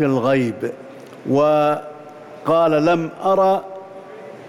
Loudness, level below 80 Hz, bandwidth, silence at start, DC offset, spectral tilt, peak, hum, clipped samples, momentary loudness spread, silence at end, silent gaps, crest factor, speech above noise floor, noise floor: -18 LUFS; -60 dBFS; 13.5 kHz; 0 s; under 0.1%; -7.5 dB/octave; -8 dBFS; none; under 0.1%; 21 LU; 0 s; none; 12 dB; 21 dB; -38 dBFS